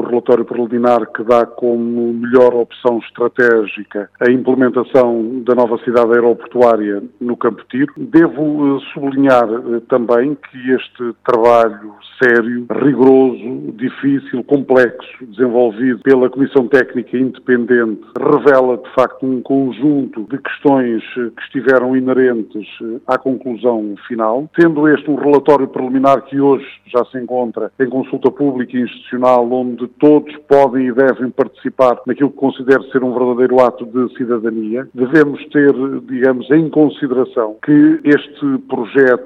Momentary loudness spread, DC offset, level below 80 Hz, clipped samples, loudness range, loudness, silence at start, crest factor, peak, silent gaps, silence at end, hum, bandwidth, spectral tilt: 9 LU; under 0.1%; -60 dBFS; 0.4%; 2 LU; -14 LUFS; 0 s; 14 dB; 0 dBFS; none; 0 s; none; 7.2 kHz; -8 dB/octave